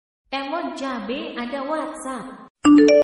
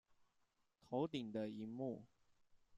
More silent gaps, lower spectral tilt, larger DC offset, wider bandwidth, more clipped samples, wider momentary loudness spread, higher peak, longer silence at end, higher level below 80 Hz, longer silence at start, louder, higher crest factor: first, 2.50-2.55 s vs none; second, -4.5 dB/octave vs -7.5 dB/octave; neither; first, 11.5 kHz vs 9.8 kHz; neither; first, 17 LU vs 5 LU; first, -4 dBFS vs -30 dBFS; about the same, 0 s vs 0 s; first, -56 dBFS vs -82 dBFS; second, 0.3 s vs 0.9 s; first, -22 LUFS vs -46 LUFS; about the same, 16 dB vs 20 dB